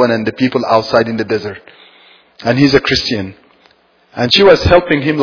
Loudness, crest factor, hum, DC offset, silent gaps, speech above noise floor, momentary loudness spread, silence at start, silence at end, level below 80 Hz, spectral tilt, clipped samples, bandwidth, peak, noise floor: -12 LUFS; 14 dB; none; under 0.1%; none; 39 dB; 15 LU; 0 s; 0 s; -36 dBFS; -5.5 dB/octave; 0.3%; 5.4 kHz; 0 dBFS; -51 dBFS